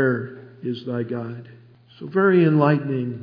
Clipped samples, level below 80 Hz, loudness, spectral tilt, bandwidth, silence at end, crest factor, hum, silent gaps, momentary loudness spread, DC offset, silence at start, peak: under 0.1%; -72 dBFS; -21 LUFS; -10.5 dB/octave; 5.2 kHz; 0 s; 18 dB; none; none; 19 LU; under 0.1%; 0 s; -4 dBFS